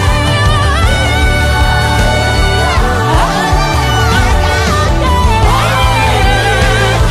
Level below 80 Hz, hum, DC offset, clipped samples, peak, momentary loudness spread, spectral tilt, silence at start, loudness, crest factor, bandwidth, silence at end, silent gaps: -14 dBFS; none; under 0.1%; under 0.1%; 0 dBFS; 1 LU; -4.5 dB/octave; 0 s; -10 LUFS; 10 dB; 15.5 kHz; 0 s; none